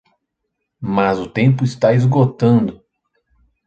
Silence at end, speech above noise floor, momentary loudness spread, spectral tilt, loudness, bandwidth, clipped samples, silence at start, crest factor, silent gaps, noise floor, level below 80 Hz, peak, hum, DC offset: 0.9 s; 61 dB; 7 LU; -8.5 dB/octave; -16 LUFS; 7.8 kHz; under 0.1%; 0.8 s; 16 dB; none; -75 dBFS; -52 dBFS; -2 dBFS; none; under 0.1%